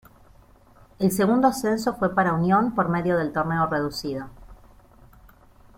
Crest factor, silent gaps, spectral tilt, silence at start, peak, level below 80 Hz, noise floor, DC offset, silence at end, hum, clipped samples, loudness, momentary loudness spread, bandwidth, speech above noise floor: 20 dB; none; -6 dB/octave; 1 s; -6 dBFS; -52 dBFS; -53 dBFS; under 0.1%; 1.25 s; none; under 0.1%; -23 LUFS; 9 LU; 16.5 kHz; 31 dB